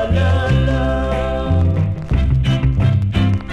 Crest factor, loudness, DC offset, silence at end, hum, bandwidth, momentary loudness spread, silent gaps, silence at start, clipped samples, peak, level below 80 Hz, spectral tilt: 12 dB; -17 LUFS; under 0.1%; 0 s; none; 8.8 kHz; 4 LU; none; 0 s; under 0.1%; -4 dBFS; -22 dBFS; -8 dB/octave